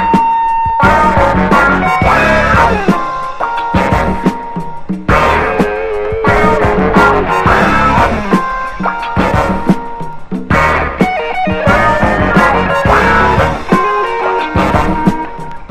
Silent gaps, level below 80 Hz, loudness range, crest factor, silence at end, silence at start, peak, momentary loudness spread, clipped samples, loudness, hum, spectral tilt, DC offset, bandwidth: none; -24 dBFS; 3 LU; 10 dB; 0.05 s; 0 s; 0 dBFS; 8 LU; 0.4%; -11 LUFS; none; -6.5 dB/octave; under 0.1%; 15 kHz